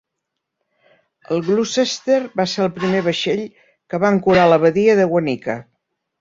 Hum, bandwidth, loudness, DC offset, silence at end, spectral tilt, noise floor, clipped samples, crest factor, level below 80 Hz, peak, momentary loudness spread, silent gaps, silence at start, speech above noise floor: none; 7.8 kHz; -17 LUFS; under 0.1%; 0.6 s; -5.5 dB/octave; -79 dBFS; under 0.1%; 16 dB; -56 dBFS; -2 dBFS; 11 LU; none; 1.3 s; 62 dB